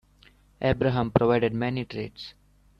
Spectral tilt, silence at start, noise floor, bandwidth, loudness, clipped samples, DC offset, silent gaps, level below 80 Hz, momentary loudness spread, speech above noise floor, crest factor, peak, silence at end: -8.5 dB/octave; 0.6 s; -58 dBFS; 6.4 kHz; -26 LUFS; under 0.1%; under 0.1%; none; -48 dBFS; 16 LU; 33 dB; 24 dB; -2 dBFS; 0.5 s